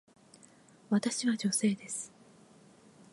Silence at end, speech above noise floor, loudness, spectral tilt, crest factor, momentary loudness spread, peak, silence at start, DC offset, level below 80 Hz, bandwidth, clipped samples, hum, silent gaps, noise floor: 1.05 s; 28 dB; -32 LUFS; -4 dB/octave; 18 dB; 10 LU; -16 dBFS; 0.9 s; under 0.1%; -82 dBFS; 11.5 kHz; under 0.1%; none; none; -60 dBFS